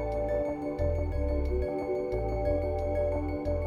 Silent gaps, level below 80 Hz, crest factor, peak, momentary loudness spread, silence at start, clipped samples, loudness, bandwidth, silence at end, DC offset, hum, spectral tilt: none; -34 dBFS; 12 dB; -16 dBFS; 2 LU; 0 s; under 0.1%; -31 LUFS; 9.2 kHz; 0 s; under 0.1%; none; -9.5 dB/octave